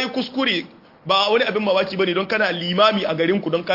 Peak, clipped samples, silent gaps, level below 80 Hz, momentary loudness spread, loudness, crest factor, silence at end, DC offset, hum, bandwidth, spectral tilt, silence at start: -4 dBFS; under 0.1%; none; -64 dBFS; 5 LU; -19 LUFS; 16 dB; 0 s; under 0.1%; none; 5.8 kHz; -5.5 dB/octave; 0 s